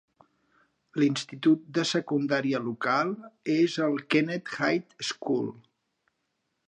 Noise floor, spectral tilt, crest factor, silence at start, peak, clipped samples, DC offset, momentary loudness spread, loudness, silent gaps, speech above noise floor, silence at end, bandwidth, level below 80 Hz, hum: -79 dBFS; -5 dB/octave; 20 dB; 0.95 s; -8 dBFS; under 0.1%; under 0.1%; 7 LU; -28 LUFS; none; 52 dB; 1.1 s; 9.8 kHz; -78 dBFS; none